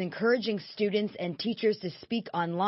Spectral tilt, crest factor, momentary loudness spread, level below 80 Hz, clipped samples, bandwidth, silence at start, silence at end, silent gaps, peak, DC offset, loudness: -9 dB/octave; 14 dB; 7 LU; -74 dBFS; under 0.1%; 6 kHz; 0 s; 0 s; none; -14 dBFS; under 0.1%; -30 LUFS